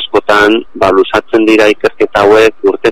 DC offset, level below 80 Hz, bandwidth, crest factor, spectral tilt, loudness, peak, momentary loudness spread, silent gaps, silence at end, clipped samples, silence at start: 3%; -40 dBFS; 15 kHz; 8 dB; -4.5 dB/octave; -8 LUFS; 0 dBFS; 4 LU; none; 0 s; 0.8%; 0 s